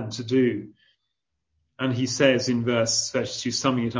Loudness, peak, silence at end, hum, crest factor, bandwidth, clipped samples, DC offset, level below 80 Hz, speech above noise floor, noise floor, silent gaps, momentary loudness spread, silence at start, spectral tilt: -23 LUFS; -4 dBFS; 0 s; none; 20 dB; 8 kHz; under 0.1%; under 0.1%; -60 dBFS; 57 dB; -81 dBFS; none; 7 LU; 0 s; -4 dB/octave